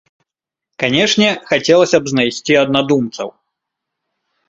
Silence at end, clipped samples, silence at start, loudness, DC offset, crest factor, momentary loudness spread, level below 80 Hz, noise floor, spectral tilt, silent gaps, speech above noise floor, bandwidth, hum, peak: 1.2 s; under 0.1%; 0.8 s; -14 LUFS; under 0.1%; 16 dB; 10 LU; -56 dBFS; -85 dBFS; -4 dB/octave; none; 71 dB; 8 kHz; none; 0 dBFS